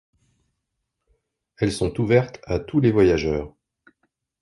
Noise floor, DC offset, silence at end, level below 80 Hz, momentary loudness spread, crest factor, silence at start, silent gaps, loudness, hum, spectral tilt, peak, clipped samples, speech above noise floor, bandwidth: -79 dBFS; under 0.1%; 0.95 s; -42 dBFS; 11 LU; 20 dB; 1.6 s; none; -21 LUFS; none; -7 dB/octave; -4 dBFS; under 0.1%; 59 dB; 11.5 kHz